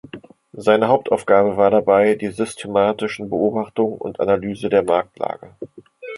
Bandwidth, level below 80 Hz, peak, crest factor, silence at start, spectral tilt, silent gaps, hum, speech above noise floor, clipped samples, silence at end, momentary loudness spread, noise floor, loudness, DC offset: 11.5 kHz; -56 dBFS; -2 dBFS; 18 dB; 0.15 s; -6 dB/octave; none; none; 22 dB; under 0.1%; 0 s; 15 LU; -40 dBFS; -18 LUFS; under 0.1%